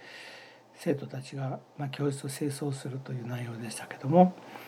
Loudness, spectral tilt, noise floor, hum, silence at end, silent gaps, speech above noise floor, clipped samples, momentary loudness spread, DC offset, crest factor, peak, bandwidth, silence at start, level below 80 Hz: -31 LUFS; -6.5 dB/octave; -52 dBFS; none; 0 s; none; 21 dB; under 0.1%; 16 LU; under 0.1%; 24 dB; -6 dBFS; 15.5 kHz; 0 s; -88 dBFS